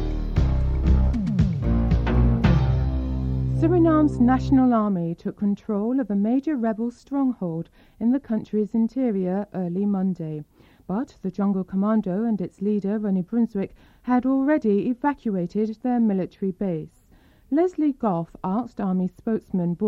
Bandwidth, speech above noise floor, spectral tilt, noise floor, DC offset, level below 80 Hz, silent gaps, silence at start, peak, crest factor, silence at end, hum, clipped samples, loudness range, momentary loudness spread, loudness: 7.2 kHz; 32 dB; -10 dB/octave; -55 dBFS; under 0.1%; -30 dBFS; none; 0 s; -6 dBFS; 16 dB; 0 s; none; under 0.1%; 5 LU; 9 LU; -23 LUFS